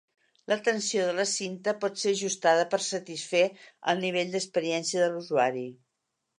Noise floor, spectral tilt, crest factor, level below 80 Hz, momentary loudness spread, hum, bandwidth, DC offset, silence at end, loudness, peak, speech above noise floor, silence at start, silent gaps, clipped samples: -82 dBFS; -3 dB/octave; 20 dB; -84 dBFS; 6 LU; none; 11 kHz; under 0.1%; 0.65 s; -28 LUFS; -10 dBFS; 54 dB; 0.5 s; none; under 0.1%